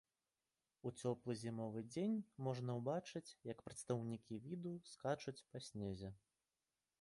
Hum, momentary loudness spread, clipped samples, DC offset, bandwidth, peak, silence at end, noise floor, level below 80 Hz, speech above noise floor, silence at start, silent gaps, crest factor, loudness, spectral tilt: none; 9 LU; under 0.1%; under 0.1%; 11.5 kHz; -28 dBFS; 0.85 s; under -90 dBFS; -76 dBFS; over 44 dB; 0.85 s; none; 20 dB; -47 LUFS; -6.5 dB/octave